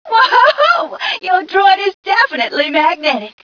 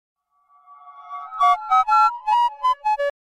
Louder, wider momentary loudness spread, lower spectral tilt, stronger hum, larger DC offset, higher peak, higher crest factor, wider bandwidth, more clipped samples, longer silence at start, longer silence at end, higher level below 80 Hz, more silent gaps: first, -12 LUFS vs -19 LUFS; second, 7 LU vs 16 LU; first, -2.5 dB/octave vs 1 dB/octave; neither; neither; first, 0 dBFS vs -8 dBFS; about the same, 12 dB vs 14 dB; second, 5.4 kHz vs 13 kHz; neither; second, 0.05 s vs 0.85 s; about the same, 0.15 s vs 0.2 s; about the same, -64 dBFS vs -62 dBFS; first, 1.94-2.03 s vs none